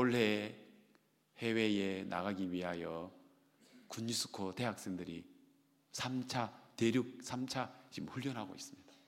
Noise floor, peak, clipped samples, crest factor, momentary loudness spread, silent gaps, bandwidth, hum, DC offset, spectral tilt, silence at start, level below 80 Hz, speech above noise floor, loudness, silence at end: -72 dBFS; -16 dBFS; under 0.1%; 24 dB; 14 LU; none; 16.5 kHz; none; under 0.1%; -4.5 dB/octave; 0 s; -78 dBFS; 34 dB; -39 LUFS; 0.15 s